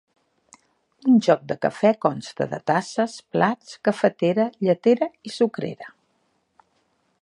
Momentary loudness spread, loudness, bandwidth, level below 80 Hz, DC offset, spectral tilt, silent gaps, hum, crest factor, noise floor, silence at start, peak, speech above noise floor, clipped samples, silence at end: 10 LU; -22 LUFS; 11 kHz; -70 dBFS; under 0.1%; -6.5 dB/octave; none; none; 20 dB; -69 dBFS; 1.05 s; -2 dBFS; 47 dB; under 0.1%; 1.35 s